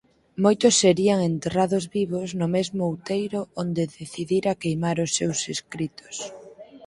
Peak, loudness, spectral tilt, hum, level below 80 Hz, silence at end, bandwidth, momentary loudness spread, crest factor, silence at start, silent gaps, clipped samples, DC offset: -4 dBFS; -24 LUFS; -4.5 dB/octave; none; -60 dBFS; 0 s; 11.5 kHz; 15 LU; 20 dB; 0.35 s; none; under 0.1%; under 0.1%